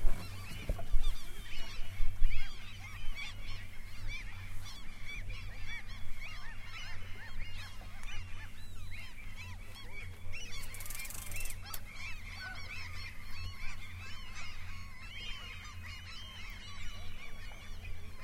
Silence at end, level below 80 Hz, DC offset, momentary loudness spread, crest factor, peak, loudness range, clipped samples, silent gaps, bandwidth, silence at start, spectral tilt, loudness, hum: 0 s; -38 dBFS; under 0.1%; 7 LU; 20 dB; -12 dBFS; 4 LU; under 0.1%; none; 15.5 kHz; 0 s; -3 dB/octave; -45 LUFS; none